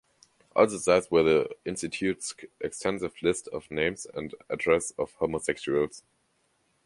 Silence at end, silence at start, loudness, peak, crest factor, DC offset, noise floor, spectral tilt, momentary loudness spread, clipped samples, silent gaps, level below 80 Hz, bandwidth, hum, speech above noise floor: 0.85 s; 0.55 s; -28 LUFS; -8 dBFS; 20 dB; under 0.1%; -71 dBFS; -4 dB/octave; 13 LU; under 0.1%; none; -58 dBFS; 11.5 kHz; none; 44 dB